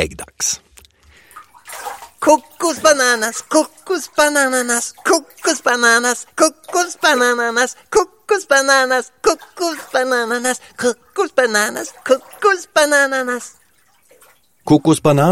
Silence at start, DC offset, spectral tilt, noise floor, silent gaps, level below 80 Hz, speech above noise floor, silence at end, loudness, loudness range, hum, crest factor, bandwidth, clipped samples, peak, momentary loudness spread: 0 s; 0.1%; -3 dB/octave; -56 dBFS; none; -52 dBFS; 40 dB; 0 s; -16 LUFS; 3 LU; none; 16 dB; 17 kHz; under 0.1%; 0 dBFS; 10 LU